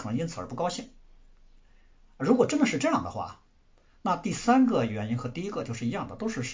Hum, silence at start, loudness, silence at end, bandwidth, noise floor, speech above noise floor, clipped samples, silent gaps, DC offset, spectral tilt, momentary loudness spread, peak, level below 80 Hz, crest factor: none; 0 s; -28 LUFS; 0 s; 7.8 kHz; -61 dBFS; 33 dB; under 0.1%; none; under 0.1%; -5.5 dB/octave; 13 LU; -8 dBFS; -56 dBFS; 20 dB